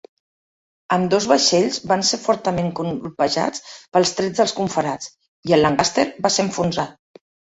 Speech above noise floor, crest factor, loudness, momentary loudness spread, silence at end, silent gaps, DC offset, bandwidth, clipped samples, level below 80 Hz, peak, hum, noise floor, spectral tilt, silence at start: over 71 dB; 20 dB; -19 LUFS; 11 LU; 0.65 s; 5.28-5.43 s; under 0.1%; 8.4 kHz; under 0.1%; -54 dBFS; -2 dBFS; none; under -90 dBFS; -4 dB/octave; 0.9 s